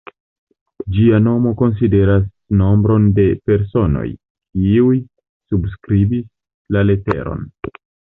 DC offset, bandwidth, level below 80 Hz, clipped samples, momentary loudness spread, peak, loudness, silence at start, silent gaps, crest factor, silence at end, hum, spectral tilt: under 0.1%; 4 kHz; -32 dBFS; under 0.1%; 14 LU; -2 dBFS; -16 LUFS; 0.85 s; 4.30-4.35 s, 5.29-5.40 s, 6.54-6.65 s; 12 dB; 0.5 s; none; -12 dB/octave